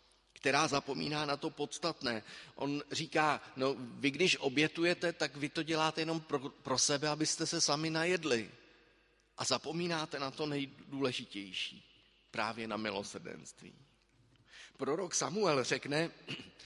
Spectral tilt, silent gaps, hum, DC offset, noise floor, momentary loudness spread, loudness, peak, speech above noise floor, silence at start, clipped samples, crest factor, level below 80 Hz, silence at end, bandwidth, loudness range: -3 dB/octave; none; none; under 0.1%; -70 dBFS; 11 LU; -35 LUFS; -14 dBFS; 34 dB; 0.45 s; under 0.1%; 22 dB; -74 dBFS; 0 s; 11.5 kHz; 7 LU